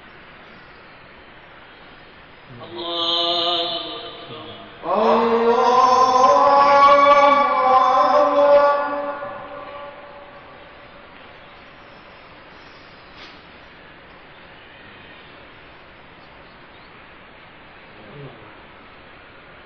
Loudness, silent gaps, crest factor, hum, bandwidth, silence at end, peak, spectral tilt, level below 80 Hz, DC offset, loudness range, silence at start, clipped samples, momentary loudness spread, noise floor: -15 LUFS; none; 18 dB; none; 7 kHz; 1.35 s; -4 dBFS; -3.5 dB/octave; -56 dBFS; under 0.1%; 18 LU; 2.5 s; under 0.1%; 27 LU; -44 dBFS